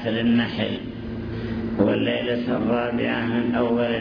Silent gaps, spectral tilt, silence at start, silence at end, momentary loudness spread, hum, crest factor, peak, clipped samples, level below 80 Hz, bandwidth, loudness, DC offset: none; -8.5 dB/octave; 0 s; 0 s; 10 LU; none; 16 dB; -6 dBFS; under 0.1%; -46 dBFS; 5.4 kHz; -23 LUFS; under 0.1%